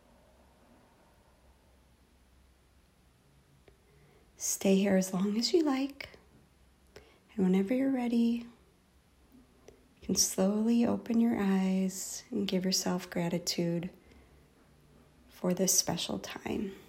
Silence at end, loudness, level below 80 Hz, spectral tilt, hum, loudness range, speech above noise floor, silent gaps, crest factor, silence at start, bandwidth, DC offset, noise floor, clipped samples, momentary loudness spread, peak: 0.1 s; -30 LUFS; -64 dBFS; -4.5 dB/octave; none; 4 LU; 35 dB; none; 20 dB; 4.4 s; 16 kHz; under 0.1%; -65 dBFS; under 0.1%; 11 LU; -14 dBFS